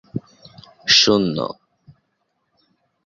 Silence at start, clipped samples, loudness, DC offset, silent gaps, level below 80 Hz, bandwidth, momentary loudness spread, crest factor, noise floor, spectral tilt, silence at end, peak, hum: 0.15 s; under 0.1%; -16 LUFS; under 0.1%; none; -58 dBFS; 7.6 kHz; 20 LU; 22 dB; -71 dBFS; -3 dB/octave; 1.55 s; 0 dBFS; none